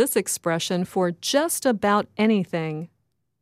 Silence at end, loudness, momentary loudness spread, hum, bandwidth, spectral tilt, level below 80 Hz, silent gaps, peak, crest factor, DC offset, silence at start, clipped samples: 0.55 s; -23 LUFS; 8 LU; none; 16 kHz; -4 dB/octave; -68 dBFS; none; -8 dBFS; 16 dB; under 0.1%; 0 s; under 0.1%